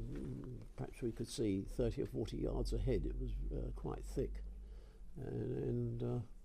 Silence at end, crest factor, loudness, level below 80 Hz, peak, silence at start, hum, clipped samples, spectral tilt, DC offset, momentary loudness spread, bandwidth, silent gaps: 0 s; 16 dB; -42 LUFS; -46 dBFS; -26 dBFS; 0 s; none; under 0.1%; -7.5 dB/octave; under 0.1%; 12 LU; 14.5 kHz; none